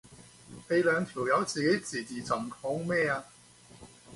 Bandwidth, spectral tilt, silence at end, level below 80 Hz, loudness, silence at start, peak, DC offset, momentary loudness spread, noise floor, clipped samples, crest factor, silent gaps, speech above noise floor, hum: 11.5 kHz; -4.5 dB/octave; 0 s; -66 dBFS; -30 LUFS; 0.05 s; -14 dBFS; under 0.1%; 10 LU; -55 dBFS; under 0.1%; 18 dB; none; 25 dB; none